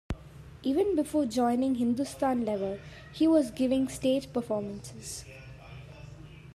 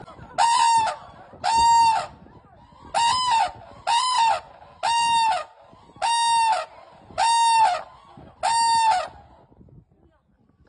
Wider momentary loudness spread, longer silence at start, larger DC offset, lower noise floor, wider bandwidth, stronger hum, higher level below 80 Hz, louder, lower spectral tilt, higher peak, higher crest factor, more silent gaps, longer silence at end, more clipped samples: first, 21 LU vs 14 LU; about the same, 0.1 s vs 0.1 s; neither; second, -48 dBFS vs -62 dBFS; first, 14 kHz vs 10.5 kHz; neither; about the same, -52 dBFS vs -56 dBFS; second, -29 LUFS vs -21 LUFS; first, -5.5 dB/octave vs 0 dB/octave; second, -14 dBFS vs -8 dBFS; about the same, 16 dB vs 16 dB; neither; second, 0 s vs 1.6 s; neither